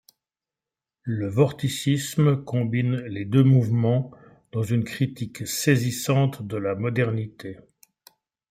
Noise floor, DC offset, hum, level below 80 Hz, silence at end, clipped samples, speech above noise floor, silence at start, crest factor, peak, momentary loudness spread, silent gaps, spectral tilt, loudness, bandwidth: -90 dBFS; under 0.1%; none; -62 dBFS; 0.95 s; under 0.1%; 67 dB; 1.05 s; 18 dB; -6 dBFS; 12 LU; none; -6.5 dB/octave; -24 LUFS; 16 kHz